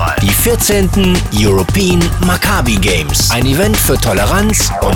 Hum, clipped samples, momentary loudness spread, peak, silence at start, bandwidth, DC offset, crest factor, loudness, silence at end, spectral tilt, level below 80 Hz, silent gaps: none; under 0.1%; 1 LU; 0 dBFS; 0 s; 19.5 kHz; under 0.1%; 10 dB; -11 LUFS; 0 s; -4 dB/octave; -20 dBFS; none